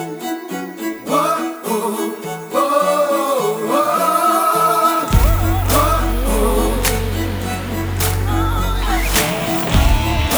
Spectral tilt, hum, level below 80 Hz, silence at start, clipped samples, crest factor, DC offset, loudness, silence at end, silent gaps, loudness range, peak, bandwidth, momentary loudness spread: -4.5 dB/octave; none; -22 dBFS; 0 s; under 0.1%; 16 dB; under 0.1%; -17 LUFS; 0 s; none; 3 LU; -2 dBFS; over 20 kHz; 9 LU